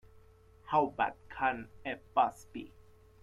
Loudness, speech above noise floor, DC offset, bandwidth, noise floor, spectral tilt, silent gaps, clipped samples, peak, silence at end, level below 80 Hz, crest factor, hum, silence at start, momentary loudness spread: -33 LUFS; 27 dB; under 0.1%; 13.5 kHz; -60 dBFS; -5.5 dB/octave; none; under 0.1%; -14 dBFS; 0.55 s; -64 dBFS; 20 dB; none; 0.65 s; 16 LU